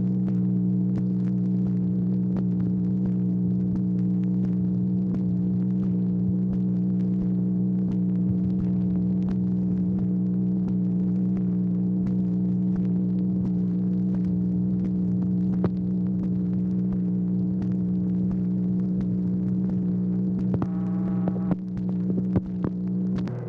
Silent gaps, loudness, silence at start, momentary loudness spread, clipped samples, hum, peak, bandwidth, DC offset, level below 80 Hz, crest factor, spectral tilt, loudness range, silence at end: none; -25 LUFS; 0 s; 1 LU; under 0.1%; 60 Hz at -40 dBFS; -12 dBFS; 2.2 kHz; under 0.1%; -48 dBFS; 12 dB; -12.5 dB/octave; 1 LU; 0 s